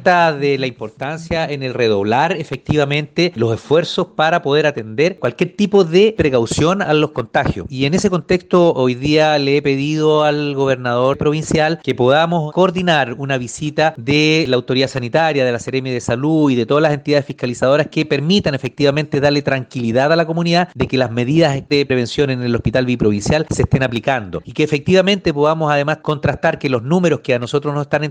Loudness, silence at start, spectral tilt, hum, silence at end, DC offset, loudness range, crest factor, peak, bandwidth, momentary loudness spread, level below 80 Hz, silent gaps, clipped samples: -16 LUFS; 0 s; -6 dB/octave; none; 0 s; under 0.1%; 2 LU; 14 dB; 0 dBFS; 9.8 kHz; 6 LU; -42 dBFS; none; under 0.1%